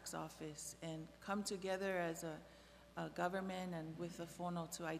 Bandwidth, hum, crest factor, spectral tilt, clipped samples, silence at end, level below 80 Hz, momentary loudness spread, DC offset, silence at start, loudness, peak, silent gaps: 15.5 kHz; none; 20 dB; -4.5 dB/octave; under 0.1%; 0 s; -72 dBFS; 9 LU; under 0.1%; 0 s; -46 LUFS; -26 dBFS; none